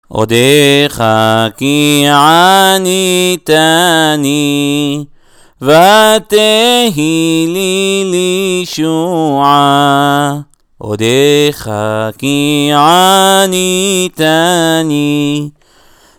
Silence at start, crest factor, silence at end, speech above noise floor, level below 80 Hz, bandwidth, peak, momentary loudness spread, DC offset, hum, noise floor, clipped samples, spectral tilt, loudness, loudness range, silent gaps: 0.1 s; 10 dB; 0.7 s; 35 dB; -48 dBFS; over 20 kHz; 0 dBFS; 9 LU; under 0.1%; none; -44 dBFS; 0.7%; -4 dB/octave; -9 LUFS; 3 LU; none